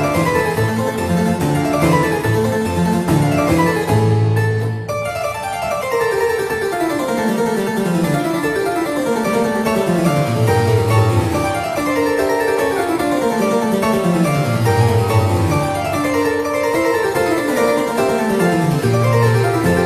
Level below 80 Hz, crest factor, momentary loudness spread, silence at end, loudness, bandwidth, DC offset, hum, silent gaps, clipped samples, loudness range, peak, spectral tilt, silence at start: -42 dBFS; 14 dB; 4 LU; 0 s; -16 LUFS; 15 kHz; under 0.1%; none; none; under 0.1%; 2 LU; -2 dBFS; -6 dB/octave; 0 s